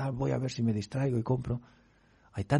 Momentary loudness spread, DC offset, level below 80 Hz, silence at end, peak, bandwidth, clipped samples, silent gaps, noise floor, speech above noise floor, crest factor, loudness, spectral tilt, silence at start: 8 LU; under 0.1%; -54 dBFS; 0 s; -14 dBFS; 10.5 kHz; under 0.1%; none; -61 dBFS; 30 dB; 18 dB; -32 LUFS; -7.5 dB/octave; 0 s